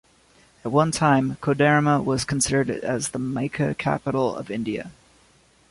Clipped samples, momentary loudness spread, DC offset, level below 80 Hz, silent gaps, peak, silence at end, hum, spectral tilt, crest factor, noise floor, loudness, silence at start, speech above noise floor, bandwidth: under 0.1%; 10 LU; under 0.1%; -52 dBFS; none; -6 dBFS; 0.8 s; none; -5 dB/octave; 18 dB; -58 dBFS; -23 LUFS; 0.65 s; 35 dB; 11.5 kHz